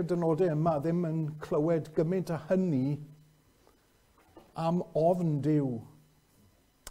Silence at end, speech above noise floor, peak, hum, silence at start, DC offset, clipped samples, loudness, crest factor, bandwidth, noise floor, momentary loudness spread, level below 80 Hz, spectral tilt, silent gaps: 0 s; 36 dB; -16 dBFS; none; 0 s; under 0.1%; under 0.1%; -30 LUFS; 16 dB; 13 kHz; -65 dBFS; 8 LU; -64 dBFS; -9 dB/octave; none